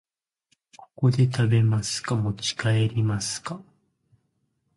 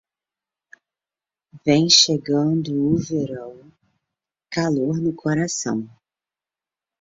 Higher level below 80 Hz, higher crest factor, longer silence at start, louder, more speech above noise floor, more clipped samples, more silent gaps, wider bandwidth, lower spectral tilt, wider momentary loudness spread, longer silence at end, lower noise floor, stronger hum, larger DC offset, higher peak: about the same, -54 dBFS vs -58 dBFS; second, 16 dB vs 22 dB; second, 1 s vs 1.55 s; second, -24 LUFS vs -20 LUFS; second, 50 dB vs over 70 dB; neither; neither; first, 11.5 kHz vs 7.8 kHz; first, -5.5 dB/octave vs -4 dB/octave; second, 9 LU vs 16 LU; about the same, 1.15 s vs 1.15 s; second, -73 dBFS vs under -90 dBFS; neither; neither; second, -10 dBFS vs -2 dBFS